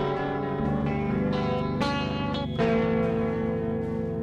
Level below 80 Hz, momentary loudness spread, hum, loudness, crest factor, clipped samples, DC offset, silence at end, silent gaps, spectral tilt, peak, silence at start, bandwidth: -42 dBFS; 5 LU; none; -27 LUFS; 12 dB; under 0.1%; under 0.1%; 0 s; none; -8 dB/octave; -14 dBFS; 0 s; 9.4 kHz